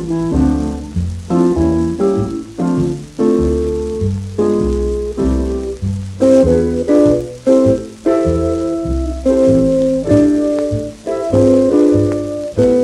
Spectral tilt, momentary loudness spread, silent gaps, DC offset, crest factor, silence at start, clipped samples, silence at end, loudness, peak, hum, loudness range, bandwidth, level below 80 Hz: -8 dB/octave; 9 LU; none; under 0.1%; 14 dB; 0 s; under 0.1%; 0 s; -15 LUFS; 0 dBFS; none; 3 LU; 12 kHz; -28 dBFS